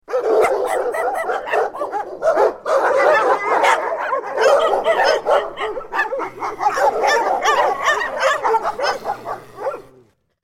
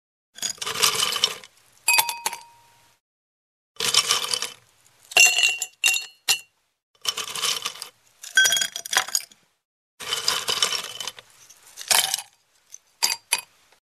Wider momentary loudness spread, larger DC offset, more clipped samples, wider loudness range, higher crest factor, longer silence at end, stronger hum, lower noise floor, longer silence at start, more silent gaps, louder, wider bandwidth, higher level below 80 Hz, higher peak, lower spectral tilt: second, 11 LU vs 14 LU; neither; neither; second, 2 LU vs 5 LU; second, 18 dB vs 24 dB; first, 0.6 s vs 0.4 s; neither; second, -53 dBFS vs -57 dBFS; second, 0.1 s vs 0.4 s; second, none vs 3.00-3.75 s, 6.83-6.94 s, 9.65-9.98 s; first, -18 LUFS vs -21 LUFS; first, 16.5 kHz vs 14.5 kHz; first, -54 dBFS vs -70 dBFS; about the same, 0 dBFS vs -2 dBFS; first, -2 dB/octave vs 2.5 dB/octave